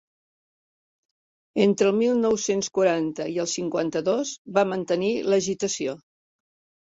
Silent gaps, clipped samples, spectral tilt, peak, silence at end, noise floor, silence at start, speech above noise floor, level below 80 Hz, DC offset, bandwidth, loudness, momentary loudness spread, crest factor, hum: 4.38-4.45 s; under 0.1%; -4.5 dB/octave; -6 dBFS; 0.85 s; under -90 dBFS; 1.55 s; over 67 dB; -66 dBFS; under 0.1%; 8 kHz; -24 LUFS; 7 LU; 20 dB; none